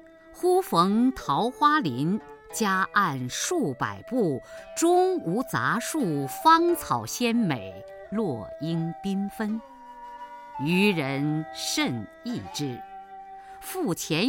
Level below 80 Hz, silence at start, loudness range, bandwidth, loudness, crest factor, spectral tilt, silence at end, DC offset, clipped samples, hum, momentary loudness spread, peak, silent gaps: -60 dBFS; 0.25 s; 6 LU; 17 kHz; -26 LUFS; 20 dB; -4.5 dB/octave; 0 s; under 0.1%; under 0.1%; none; 18 LU; -6 dBFS; none